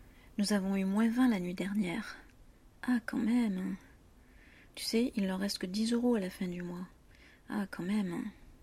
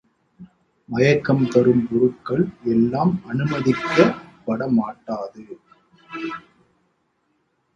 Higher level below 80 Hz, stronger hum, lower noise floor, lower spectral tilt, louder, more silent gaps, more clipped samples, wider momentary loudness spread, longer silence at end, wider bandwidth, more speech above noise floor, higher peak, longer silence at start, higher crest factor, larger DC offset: about the same, -60 dBFS vs -56 dBFS; neither; second, -59 dBFS vs -68 dBFS; second, -5.5 dB/octave vs -7.5 dB/octave; second, -34 LUFS vs -20 LUFS; neither; neither; about the same, 14 LU vs 15 LU; second, 0.1 s vs 1.35 s; first, 15 kHz vs 7.4 kHz; second, 27 dB vs 49 dB; second, -18 dBFS vs 0 dBFS; second, 0 s vs 0.4 s; second, 16 dB vs 22 dB; neither